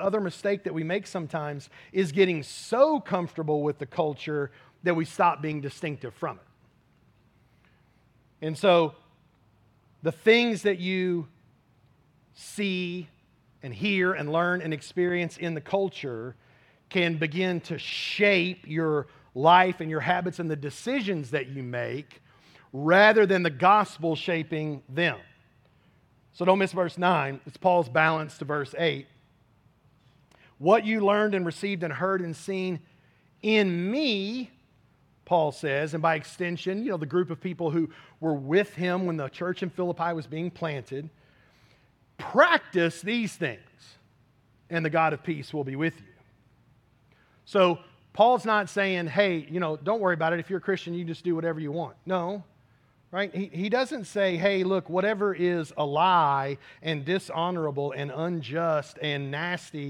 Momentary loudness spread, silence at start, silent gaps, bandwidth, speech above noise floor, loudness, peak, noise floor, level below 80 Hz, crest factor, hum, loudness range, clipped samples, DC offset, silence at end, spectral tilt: 12 LU; 0 s; none; 13 kHz; 37 dB; -26 LUFS; -4 dBFS; -63 dBFS; -72 dBFS; 22 dB; none; 6 LU; under 0.1%; under 0.1%; 0 s; -6 dB/octave